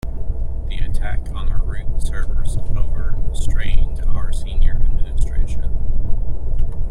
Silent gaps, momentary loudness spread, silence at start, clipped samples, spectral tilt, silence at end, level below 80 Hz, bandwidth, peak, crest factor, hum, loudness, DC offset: none; 4 LU; 0.05 s; under 0.1%; -6 dB/octave; 0 s; -18 dBFS; 9.6 kHz; -2 dBFS; 12 dB; none; -26 LUFS; under 0.1%